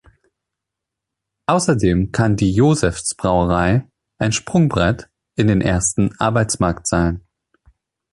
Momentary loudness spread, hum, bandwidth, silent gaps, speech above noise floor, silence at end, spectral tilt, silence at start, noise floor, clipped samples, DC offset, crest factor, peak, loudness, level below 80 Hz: 6 LU; none; 11.5 kHz; none; 66 dB; 0.95 s; -5.5 dB/octave; 1.5 s; -83 dBFS; under 0.1%; under 0.1%; 16 dB; -2 dBFS; -18 LUFS; -34 dBFS